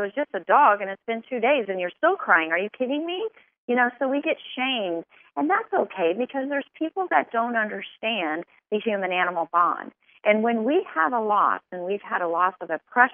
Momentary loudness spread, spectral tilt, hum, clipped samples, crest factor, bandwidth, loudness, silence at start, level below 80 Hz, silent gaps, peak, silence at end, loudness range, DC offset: 10 LU; -1.5 dB/octave; none; under 0.1%; 22 dB; 3.7 kHz; -24 LUFS; 0 s; -86 dBFS; 3.58-3.68 s; -2 dBFS; 0 s; 3 LU; under 0.1%